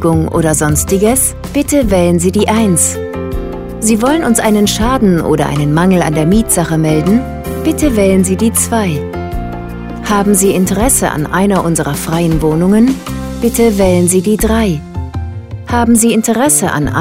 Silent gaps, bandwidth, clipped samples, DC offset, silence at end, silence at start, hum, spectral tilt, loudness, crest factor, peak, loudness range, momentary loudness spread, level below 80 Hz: none; 16.5 kHz; under 0.1%; 0.3%; 0 s; 0 s; none; -5 dB/octave; -11 LUFS; 12 dB; 0 dBFS; 2 LU; 11 LU; -26 dBFS